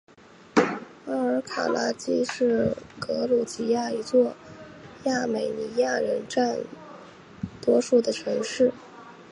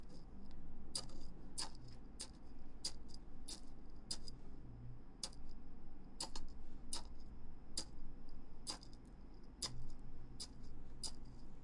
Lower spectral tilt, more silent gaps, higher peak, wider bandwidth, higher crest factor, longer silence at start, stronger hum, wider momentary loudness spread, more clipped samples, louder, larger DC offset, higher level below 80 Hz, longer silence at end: first, -4.5 dB/octave vs -2.5 dB/octave; neither; first, -4 dBFS vs -26 dBFS; about the same, 11 kHz vs 11.5 kHz; about the same, 22 dB vs 18 dB; first, 0.55 s vs 0 s; neither; first, 20 LU vs 13 LU; neither; first, -26 LUFS vs -52 LUFS; neither; second, -62 dBFS vs -52 dBFS; about the same, 0.1 s vs 0 s